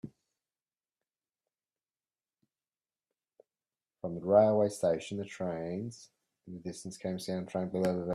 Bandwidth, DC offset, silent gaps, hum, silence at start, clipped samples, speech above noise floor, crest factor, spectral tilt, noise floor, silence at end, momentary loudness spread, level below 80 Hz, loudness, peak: 13.5 kHz; under 0.1%; none; none; 0.05 s; under 0.1%; over 58 dB; 24 dB; -6.5 dB/octave; under -90 dBFS; 0 s; 19 LU; -72 dBFS; -32 LUFS; -12 dBFS